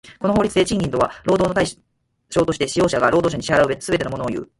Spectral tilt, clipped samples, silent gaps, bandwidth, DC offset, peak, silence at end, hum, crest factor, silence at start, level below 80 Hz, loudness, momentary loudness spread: -5 dB/octave; under 0.1%; none; 11.5 kHz; under 0.1%; -2 dBFS; 0.15 s; none; 18 dB; 0.05 s; -44 dBFS; -19 LUFS; 5 LU